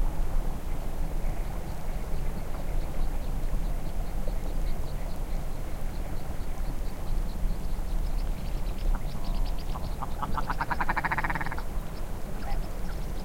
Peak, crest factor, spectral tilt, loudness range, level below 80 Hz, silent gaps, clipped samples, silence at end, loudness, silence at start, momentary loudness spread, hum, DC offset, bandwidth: -12 dBFS; 14 dB; -5.5 dB/octave; 4 LU; -30 dBFS; none; under 0.1%; 0 s; -35 LUFS; 0 s; 7 LU; none; 1%; 16.5 kHz